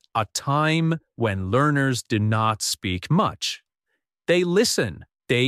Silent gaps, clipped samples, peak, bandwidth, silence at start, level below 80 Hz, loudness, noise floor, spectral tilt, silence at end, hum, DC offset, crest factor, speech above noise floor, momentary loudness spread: none; under 0.1%; -8 dBFS; 15 kHz; 0.15 s; -56 dBFS; -23 LUFS; -78 dBFS; -4.5 dB/octave; 0 s; none; under 0.1%; 16 dB; 56 dB; 7 LU